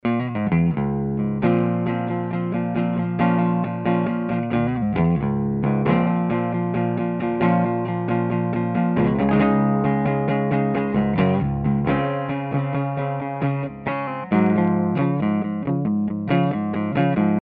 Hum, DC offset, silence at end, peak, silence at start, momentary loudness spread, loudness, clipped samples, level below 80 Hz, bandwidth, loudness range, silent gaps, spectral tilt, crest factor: none; under 0.1%; 0.15 s; -6 dBFS; 0.05 s; 5 LU; -22 LUFS; under 0.1%; -46 dBFS; 4.6 kHz; 2 LU; none; -12 dB/octave; 16 dB